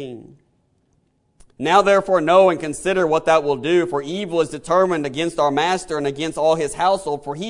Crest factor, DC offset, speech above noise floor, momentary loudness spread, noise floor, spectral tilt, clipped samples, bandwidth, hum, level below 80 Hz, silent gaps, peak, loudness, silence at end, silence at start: 18 dB; under 0.1%; 45 dB; 9 LU; -64 dBFS; -4.5 dB/octave; under 0.1%; 11 kHz; none; -52 dBFS; none; 0 dBFS; -18 LUFS; 0 s; 0 s